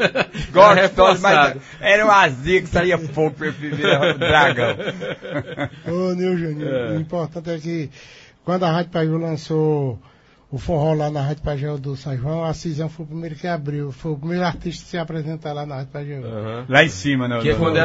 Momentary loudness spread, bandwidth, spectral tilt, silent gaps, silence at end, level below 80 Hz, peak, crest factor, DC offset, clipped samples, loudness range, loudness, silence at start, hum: 15 LU; 8 kHz; -6 dB/octave; none; 0 s; -42 dBFS; 0 dBFS; 20 dB; under 0.1%; under 0.1%; 10 LU; -19 LUFS; 0 s; none